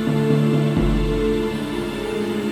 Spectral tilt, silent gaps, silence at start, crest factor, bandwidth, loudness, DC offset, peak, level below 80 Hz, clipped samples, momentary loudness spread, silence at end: -7.5 dB/octave; none; 0 s; 14 dB; 15 kHz; -21 LUFS; under 0.1%; -6 dBFS; -30 dBFS; under 0.1%; 7 LU; 0 s